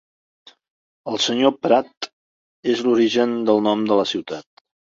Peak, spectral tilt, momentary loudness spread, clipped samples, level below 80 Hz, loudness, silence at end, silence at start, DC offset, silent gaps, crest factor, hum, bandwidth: -2 dBFS; -4.5 dB/octave; 16 LU; under 0.1%; -68 dBFS; -19 LUFS; 0.45 s; 1.05 s; under 0.1%; 1.97-2.01 s, 2.13-2.63 s; 18 dB; none; 7.8 kHz